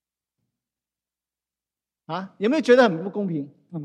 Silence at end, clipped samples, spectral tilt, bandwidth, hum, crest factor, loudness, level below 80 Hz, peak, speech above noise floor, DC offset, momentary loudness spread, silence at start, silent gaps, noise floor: 0 s; under 0.1%; -6 dB/octave; 9.6 kHz; none; 22 dB; -21 LUFS; -74 dBFS; -4 dBFS; over 68 dB; under 0.1%; 16 LU; 2.1 s; none; under -90 dBFS